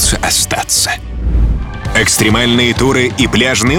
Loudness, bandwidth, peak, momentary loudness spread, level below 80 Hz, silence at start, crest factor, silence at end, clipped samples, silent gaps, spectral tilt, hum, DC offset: -12 LUFS; 18 kHz; 0 dBFS; 7 LU; -20 dBFS; 0 s; 12 dB; 0 s; under 0.1%; none; -3 dB/octave; none; under 0.1%